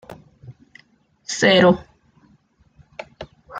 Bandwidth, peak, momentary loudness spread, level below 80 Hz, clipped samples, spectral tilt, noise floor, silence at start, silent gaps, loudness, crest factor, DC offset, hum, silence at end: 9.2 kHz; -2 dBFS; 26 LU; -56 dBFS; under 0.1%; -4.5 dB/octave; -58 dBFS; 0.1 s; none; -16 LUFS; 20 dB; under 0.1%; none; 0 s